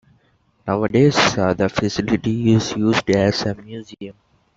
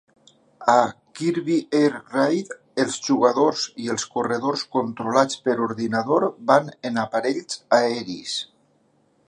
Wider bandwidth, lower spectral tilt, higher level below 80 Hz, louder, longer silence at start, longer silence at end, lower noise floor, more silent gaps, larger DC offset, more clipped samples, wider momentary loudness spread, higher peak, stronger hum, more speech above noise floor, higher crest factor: second, 8 kHz vs 11 kHz; about the same, -5.5 dB/octave vs -4.5 dB/octave; first, -48 dBFS vs -70 dBFS; first, -18 LUFS vs -22 LUFS; about the same, 0.65 s vs 0.6 s; second, 0.45 s vs 0.8 s; about the same, -60 dBFS vs -63 dBFS; neither; neither; neither; first, 19 LU vs 9 LU; about the same, -2 dBFS vs -2 dBFS; neither; about the same, 42 dB vs 41 dB; second, 16 dB vs 22 dB